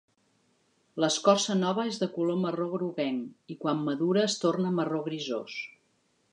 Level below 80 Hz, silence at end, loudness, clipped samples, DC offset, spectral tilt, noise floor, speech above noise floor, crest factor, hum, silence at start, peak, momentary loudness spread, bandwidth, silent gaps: -80 dBFS; 0.65 s; -29 LUFS; under 0.1%; under 0.1%; -5 dB/octave; -71 dBFS; 43 dB; 22 dB; none; 0.95 s; -6 dBFS; 12 LU; 11 kHz; none